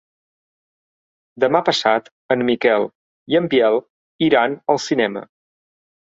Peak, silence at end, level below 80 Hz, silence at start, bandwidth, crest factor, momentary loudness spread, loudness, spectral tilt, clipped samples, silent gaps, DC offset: -2 dBFS; 0.95 s; -62 dBFS; 1.35 s; 7.8 kHz; 18 dB; 7 LU; -18 LUFS; -5 dB/octave; under 0.1%; 2.12-2.29 s, 2.95-3.26 s, 3.90-4.19 s; under 0.1%